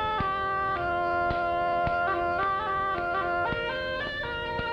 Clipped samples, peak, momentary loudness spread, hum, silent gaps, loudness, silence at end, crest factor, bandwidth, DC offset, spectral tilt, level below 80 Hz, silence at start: under 0.1%; -16 dBFS; 4 LU; none; none; -28 LUFS; 0 s; 12 dB; 7.6 kHz; under 0.1%; -6.5 dB/octave; -46 dBFS; 0 s